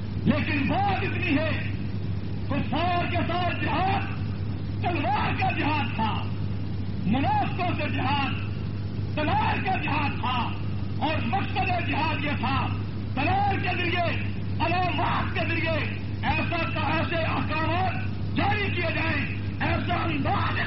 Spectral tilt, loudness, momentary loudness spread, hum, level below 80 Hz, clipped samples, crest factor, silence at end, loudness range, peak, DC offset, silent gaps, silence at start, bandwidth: -4.5 dB/octave; -27 LUFS; 6 LU; none; -42 dBFS; under 0.1%; 16 dB; 0 s; 1 LU; -10 dBFS; 2%; none; 0 s; 5.8 kHz